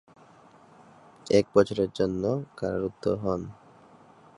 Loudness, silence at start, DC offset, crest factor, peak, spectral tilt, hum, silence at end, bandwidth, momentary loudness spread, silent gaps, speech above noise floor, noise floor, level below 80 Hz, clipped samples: -27 LUFS; 1.25 s; under 0.1%; 22 dB; -6 dBFS; -6.5 dB/octave; none; 0.85 s; 11 kHz; 10 LU; none; 29 dB; -55 dBFS; -56 dBFS; under 0.1%